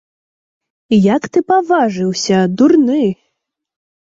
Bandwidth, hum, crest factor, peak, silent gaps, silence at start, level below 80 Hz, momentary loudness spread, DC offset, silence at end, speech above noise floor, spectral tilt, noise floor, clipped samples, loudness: 8 kHz; none; 12 dB; -2 dBFS; none; 0.9 s; -56 dBFS; 6 LU; under 0.1%; 0.9 s; 61 dB; -6 dB/octave; -73 dBFS; under 0.1%; -13 LUFS